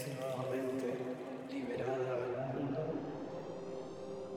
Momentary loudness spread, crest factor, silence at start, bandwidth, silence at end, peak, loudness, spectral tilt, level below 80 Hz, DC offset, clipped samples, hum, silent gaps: 7 LU; 14 dB; 0 s; 16.5 kHz; 0 s; -26 dBFS; -40 LUFS; -7 dB/octave; -72 dBFS; under 0.1%; under 0.1%; none; none